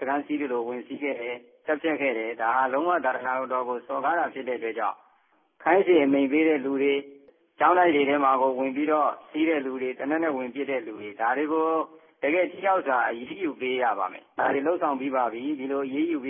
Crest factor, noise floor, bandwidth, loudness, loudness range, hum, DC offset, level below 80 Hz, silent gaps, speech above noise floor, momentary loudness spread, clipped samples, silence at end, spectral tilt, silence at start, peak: 18 dB; -65 dBFS; 3.6 kHz; -26 LUFS; 4 LU; none; under 0.1%; -76 dBFS; none; 40 dB; 10 LU; under 0.1%; 0 s; -9 dB/octave; 0 s; -6 dBFS